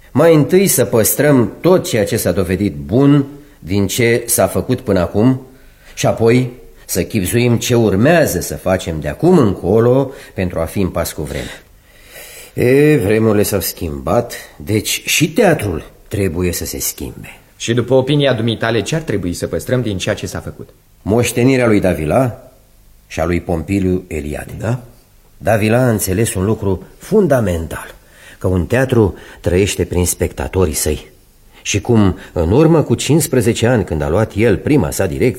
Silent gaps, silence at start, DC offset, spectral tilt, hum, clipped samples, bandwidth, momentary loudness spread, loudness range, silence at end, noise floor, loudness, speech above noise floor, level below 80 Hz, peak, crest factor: none; 0.15 s; under 0.1%; -5.5 dB/octave; none; under 0.1%; 16.5 kHz; 12 LU; 4 LU; 0 s; -46 dBFS; -15 LUFS; 32 dB; -36 dBFS; 0 dBFS; 14 dB